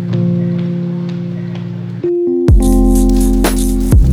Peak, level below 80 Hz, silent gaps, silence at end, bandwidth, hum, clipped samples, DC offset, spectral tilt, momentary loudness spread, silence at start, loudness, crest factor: 0 dBFS; -16 dBFS; none; 0 s; 15.5 kHz; none; under 0.1%; under 0.1%; -7 dB/octave; 11 LU; 0 s; -14 LUFS; 12 dB